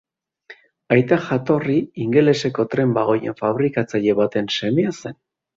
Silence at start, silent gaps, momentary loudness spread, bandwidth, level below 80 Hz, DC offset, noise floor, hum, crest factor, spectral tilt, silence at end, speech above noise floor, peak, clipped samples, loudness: 0.5 s; none; 5 LU; 7.8 kHz; -58 dBFS; under 0.1%; -47 dBFS; none; 18 dB; -6.5 dB/octave; 0.45 s; 28 dB; -2 dBFS; under 0.1%; -19 LUFS